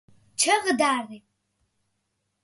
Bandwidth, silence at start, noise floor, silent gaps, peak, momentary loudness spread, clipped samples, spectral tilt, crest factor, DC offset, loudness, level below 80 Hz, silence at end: 12 kHz; 0.4 s; -77 dBFS; none; -8 dBFS; 17 LU; under 0.1%; -1 dB/octave; 20 dB; under 0.1%; -23 LUFS; -72 dBFS; 1.25 s